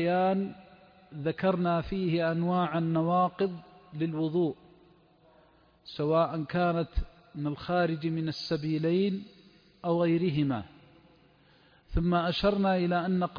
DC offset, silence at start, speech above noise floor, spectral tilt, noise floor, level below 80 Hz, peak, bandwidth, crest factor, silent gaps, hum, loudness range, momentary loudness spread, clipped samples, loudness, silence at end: under 0.1%; 0 s; 33 dB; -8.5 dB/octave; -62 dBFS; -46 dBFS; -14 dBFS; 5.2 kHz; 16 dB; none; none; 3 LU; 11 LU; under 0.1%; -29 LUFS; 0 s